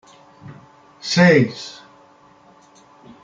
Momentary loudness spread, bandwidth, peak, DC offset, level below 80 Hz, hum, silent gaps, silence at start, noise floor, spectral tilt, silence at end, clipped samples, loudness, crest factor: 21 LU; 7.8 kHz; -2 dBFS; under 0.1%; -62 dBFS; none; none; 0.45 s; -50 dBFS; -5.5 dB/octave; 1.5 s; under 0.1%; -15 LUFS; 20 dB